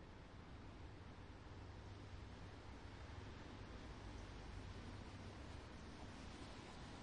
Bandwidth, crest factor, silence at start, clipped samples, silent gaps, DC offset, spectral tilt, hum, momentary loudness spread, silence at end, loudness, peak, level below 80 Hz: 10.5 kHz; 14 dB; 0 s; under 0.1%; none; under 0.1%; -5.5 dB/octave; none; 3 LU; 0 s; -57 LUFS; -42 dBFS; -60 dBFS